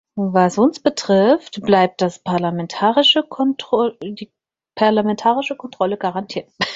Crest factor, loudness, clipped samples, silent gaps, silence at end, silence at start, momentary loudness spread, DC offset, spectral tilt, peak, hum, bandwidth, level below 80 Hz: 16 dB; -17 LUFS; under 0.1%; none; 0 s; 0.15 s; 12 LU; under 0.1%; -5 dB/octave; -2 dBFS; none; 8 kHz; -60 dBFS